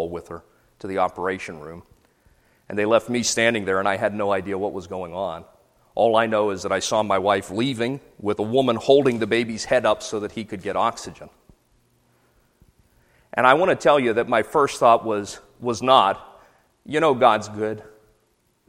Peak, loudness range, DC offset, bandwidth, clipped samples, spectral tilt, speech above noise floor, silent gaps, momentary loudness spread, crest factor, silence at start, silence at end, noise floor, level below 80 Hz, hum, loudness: 0 dBFS; 6 LU; under 0.1%; 15.5 kHz; under 0.1%; -4 dB/octave; 45 dB; none; 15 LU; 22 dB; 0 s; 0.8 s; -66 dBFS; -58 dBFS; none; -21 LUFS